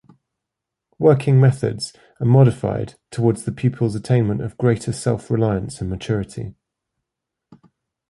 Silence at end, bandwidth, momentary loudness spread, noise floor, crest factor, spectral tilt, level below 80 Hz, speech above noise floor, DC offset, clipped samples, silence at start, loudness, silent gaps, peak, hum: 1.6 s; 11.5 kHz; 14 LU; -83 dBFS; 18 dB; -7.5 dB/octave; -46 dBFS; 65 dB; under 0.1%; under 0.1%; 1 s; -19 LUFS; none; -2 dBFS; none